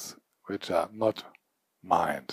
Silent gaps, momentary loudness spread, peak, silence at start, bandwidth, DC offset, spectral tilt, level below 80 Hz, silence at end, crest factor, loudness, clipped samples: none; 15 LU; -8 dBFS; 0 s; 15.5 kHz; under 0.1%; -4.5 dB/octave; -68 dBFS; 0 s; 24 dB; -30 LUFS; under 0.1%